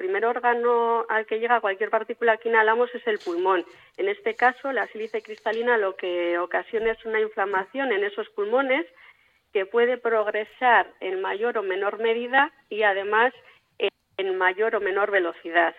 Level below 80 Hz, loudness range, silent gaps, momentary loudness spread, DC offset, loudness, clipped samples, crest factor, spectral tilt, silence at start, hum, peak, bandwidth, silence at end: -66 dBFS; 3 LU; none; 8 LU; under 0.1%; -24 LUFS; under 0.1%; 18 dB; -5 dB/octave; 0 s; none; -6 dBFS; 7 kHz; 0.05 s